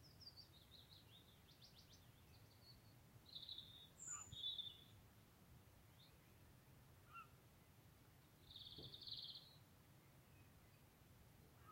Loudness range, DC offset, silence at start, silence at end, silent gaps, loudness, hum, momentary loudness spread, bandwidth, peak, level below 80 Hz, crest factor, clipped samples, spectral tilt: 11 LU; under 0.1%; 0 s; 0 s; none; -58 LUFS; none; 17 LU; 16 kHz; -40 dBFS; -78 dBFS; 22 dB; under 0.1%; -2 dB/octave